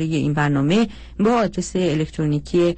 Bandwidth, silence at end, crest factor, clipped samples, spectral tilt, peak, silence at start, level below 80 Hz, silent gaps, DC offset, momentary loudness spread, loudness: 8.8 kHz; 0 s; 12 dB; under 0.1%; -6.5 dB/octave; -8 dBFS; 0 s; -42 dBFS; none; under 0.1%; 4 LU; -20 LUFS